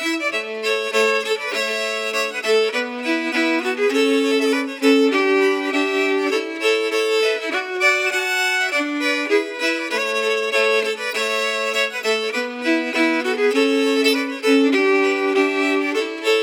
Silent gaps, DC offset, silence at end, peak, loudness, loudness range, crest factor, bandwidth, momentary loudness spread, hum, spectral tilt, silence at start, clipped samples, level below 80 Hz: none; under 0.1%; 0 s; -4 dBFS; -19 LUFS; 2 LU; 16 dB; 19 kHz; 5 LU; none; -1.5 dB/octave; 0 s; under 0.1%; -90 dBFS